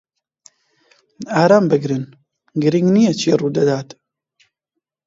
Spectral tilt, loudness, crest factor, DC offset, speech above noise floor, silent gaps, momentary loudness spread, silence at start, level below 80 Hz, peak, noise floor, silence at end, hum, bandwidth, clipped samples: -6.5 dB/octave; -16 LUFS; 18 dB; under 0.1%; 64 dB; none; 16 LU; 1.2 s; -64 dBFS; 0 dBFS; -79 dBFS; 1.25 s; none; 7.8 kHz; under 0.1%